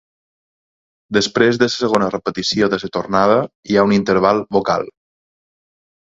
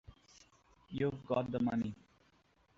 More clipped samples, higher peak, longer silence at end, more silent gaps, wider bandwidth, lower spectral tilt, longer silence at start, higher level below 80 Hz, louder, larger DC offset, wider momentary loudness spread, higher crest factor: neither; first, 0 dBFS vs -20 dBFS; first, 1.25 s vs 0.85 s; first, 3.55-3.63 s vs none; about the same, 7.8 kHz vs 7.6 kHz; second, -5 dB/octave vs -7 dB/octave; first, 1.1 s vs 0.1 s; first, -52 dBFS vs -66 dBFS; first, -16 LUFS vs -37 LUFS; neither; second, 6 LU vs 12 LU; about the same, 18 dB vs 20 dB